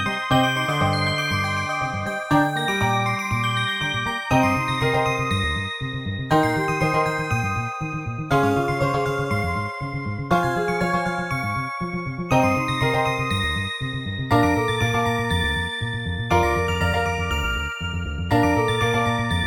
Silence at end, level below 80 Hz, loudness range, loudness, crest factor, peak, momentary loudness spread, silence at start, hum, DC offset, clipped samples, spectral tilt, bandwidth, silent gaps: 0 s; -38 dBFS; 2 LU; -22 LUFS; 16 dB; -6 dBFS; 8 LU; 0 s; none; under 0.1%; under 0.1%; -5.5 dB/octave; 17 kHz; none